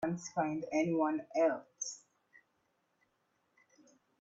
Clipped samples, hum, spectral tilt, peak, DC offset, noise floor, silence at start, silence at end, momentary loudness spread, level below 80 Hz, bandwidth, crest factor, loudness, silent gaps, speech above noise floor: under 0.1%; none; -5 dB/octave; -20 dBFS; under 0.1%; -79 dBFS; 0 s; 2.25 s; 10 LU; -80 dBFS; 8 kHz; 18 dB; -35 LUFS; none; 44 dB